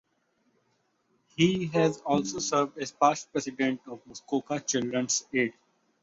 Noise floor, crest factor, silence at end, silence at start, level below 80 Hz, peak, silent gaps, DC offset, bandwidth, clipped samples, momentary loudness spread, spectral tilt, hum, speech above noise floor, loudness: -73 dBFS; 22 dB; 0.5 s; 1.4 s; -68 dBFS; -8 dBFS; none; under 0.1%; 8 kHz; under 0.1%; 8 LU; -4 dB/octave; none; 45 dB; -28 LUFS